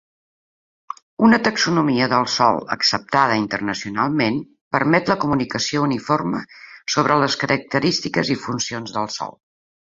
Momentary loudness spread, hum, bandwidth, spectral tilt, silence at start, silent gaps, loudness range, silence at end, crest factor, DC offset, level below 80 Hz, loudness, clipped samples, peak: 11 LU; none; 7.8 kHz; -4.5 dB/octave; 1.2 s; 4.61-4.71 s; 3 LU; 0.7 s; 20 dB; under 0.1%; -56 dBFS; -19 LUFS; under 0.1%; 0 dBFS